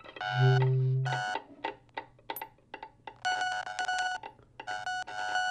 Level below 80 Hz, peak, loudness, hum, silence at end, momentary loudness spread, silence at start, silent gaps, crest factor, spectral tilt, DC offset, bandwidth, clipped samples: -70 dBFS; -14 dBFS; -32 LUFS; none; 0 s; 20 LU; 0.05 s; none; 18 dB; -5 dB/octave; under 0.1%; 12 kHz; under 0.1%